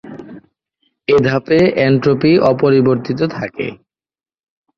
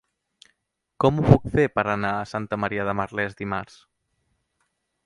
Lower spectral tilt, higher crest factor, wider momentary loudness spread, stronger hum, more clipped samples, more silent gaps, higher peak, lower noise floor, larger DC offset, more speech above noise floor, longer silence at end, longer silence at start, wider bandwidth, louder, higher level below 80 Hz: about the same, -8 dB/octave vs -8 dB/octave; second, 14 dB vs 24 dB; about the same, 14 LU vs 12 LU; neither; neither; neither; about the same, -2 dBFS vs 0 dBFS; second, -66 dBFS vs -76 dBFS; neither; about the same, 53 dB vs 54 dB; second, 1.05 s vs 1.4 s; second, 0.05 s vs 1 s; second, 7.2 kHz vs 11 kHz; first, -14 LUFS vs -23 LUFS; about the same, -50 dBFS vs -46 dBFS